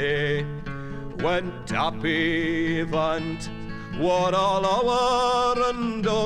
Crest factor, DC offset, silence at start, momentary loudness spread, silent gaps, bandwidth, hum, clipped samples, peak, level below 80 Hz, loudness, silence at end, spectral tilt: 14 dB; under 0.1%; 0 s; 13 LU; none; 11.5 kHz; none; under 0.1%; -10 dBFS; -42 dBFS; -24 LUFS; 0 s; -5 dB/octave